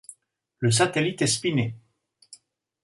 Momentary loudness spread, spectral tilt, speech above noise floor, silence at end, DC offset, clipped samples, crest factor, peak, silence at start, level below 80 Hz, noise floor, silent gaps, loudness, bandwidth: 7 LU; -4 dB/octave; 36 dB; 0.5 s; under 0.1%; under 0.1%; 20 dB; -8 dBFS; 0.1 s; -62 dBFS; -59 dBFS; none; -24 LUFS; 11.5 kHz